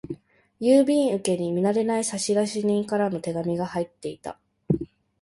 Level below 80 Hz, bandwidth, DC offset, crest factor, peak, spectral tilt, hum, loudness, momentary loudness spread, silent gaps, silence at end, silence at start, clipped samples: -58 dBFS; 11.5 kHz; under 0.1%; 18 dB; -8 dBFS; -5.5 dB/octave; none; -24 LUFS; 17 LU; none; 0.35 s; 0.05 s; under 0.1%